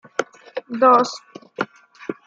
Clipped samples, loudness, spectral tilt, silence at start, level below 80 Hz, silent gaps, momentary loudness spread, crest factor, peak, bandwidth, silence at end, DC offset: under 0.1%; -19 LUFS; -4 dB/octave; 0.2 s; -76 dBFS; none; 21 LU; 20 dB; -2 dBFS; 7.8 kHz; 0.15 s; under 0.1%